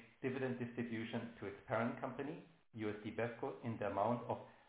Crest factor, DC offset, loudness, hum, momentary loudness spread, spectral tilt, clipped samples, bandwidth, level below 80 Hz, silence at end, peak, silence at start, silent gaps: 20 dB; under 0.1%; -43 LUFS; none; 9 LU; -6 dB/octave; under 0.1%; 4 kHz; -74 dBFS; 0.05 s; -24 dBFS; 0 s; none